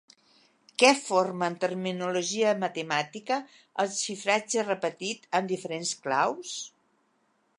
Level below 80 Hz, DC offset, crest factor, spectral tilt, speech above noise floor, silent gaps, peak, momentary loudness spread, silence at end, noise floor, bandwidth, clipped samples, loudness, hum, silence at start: -82 dBFS; under 0.1%; 26 dB; -3 dB/octave; 43 dB; none; -4 dBFS; 12 LU; 0.9 s; -71 dBFS; 11.5 kHz; under 0.1%; -28 LUFS; none; 0.8 s